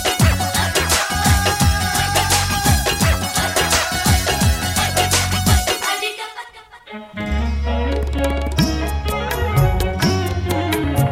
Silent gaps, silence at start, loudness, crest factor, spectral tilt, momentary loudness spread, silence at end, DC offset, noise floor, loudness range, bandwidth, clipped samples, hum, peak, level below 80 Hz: none; 0 s; -17 LUFS; 16 dB; -3.5 dB/octave; 7 LU; 0 s; under 0.1%; -40 dBFS; 6 LU; 17 kHz; under 0.1%; none; -2 dBFS; -24 dBFS